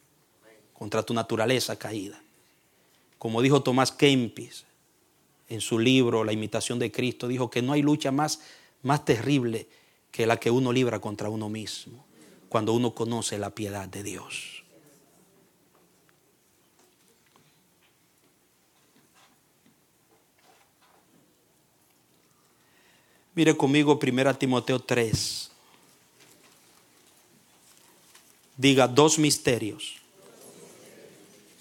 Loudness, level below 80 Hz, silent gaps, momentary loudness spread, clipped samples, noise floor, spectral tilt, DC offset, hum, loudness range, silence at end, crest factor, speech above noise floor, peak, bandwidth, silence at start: -26 LUFS; -66 dBFS; none; 16 LU; under 0.1%; -65 dBFS; -4.5 dB/octave; under 0.1%; none; 8 LU; 0.95 s; 24 dB; 40 dB; -4 dBFS; 17 kHz; 0.8 s